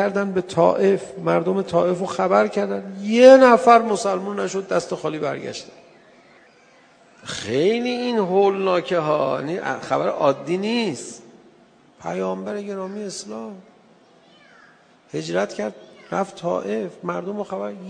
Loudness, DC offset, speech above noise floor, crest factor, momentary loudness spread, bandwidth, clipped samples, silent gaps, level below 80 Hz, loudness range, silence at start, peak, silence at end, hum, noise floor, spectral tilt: -20 LUFS; under 0.1%; 33 dB; 20 dB; 16 LU; 10 kHz; under 0.1%; none; -66 dBFS; 15 LU; 0 s; 0 dBFS; 0 s; none; -53 dBFS; -5.5 dB/octave